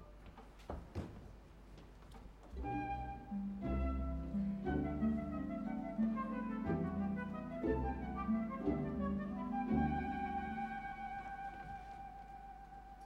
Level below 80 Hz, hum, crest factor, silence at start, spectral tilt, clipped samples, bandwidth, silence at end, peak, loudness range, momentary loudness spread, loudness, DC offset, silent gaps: -50 dBFS; none; 16 dB; 0 s; -9 dB/octave; under 0.1%; 7.6 kHz; 0 s; -24 dBFS; 6 LU; 19 LU; -41 LUFS; under 0.1%; none